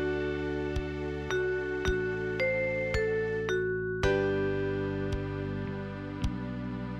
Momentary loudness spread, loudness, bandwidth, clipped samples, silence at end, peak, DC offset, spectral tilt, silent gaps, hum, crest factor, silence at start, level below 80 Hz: 7 LU; -32 LUFS; 8.8 kHz; under 0.1%; 0 s; -14 dBFS; under 0.1%; -6.5 dB/octave; none; none; 16 dB; 0 s; -42 dBFS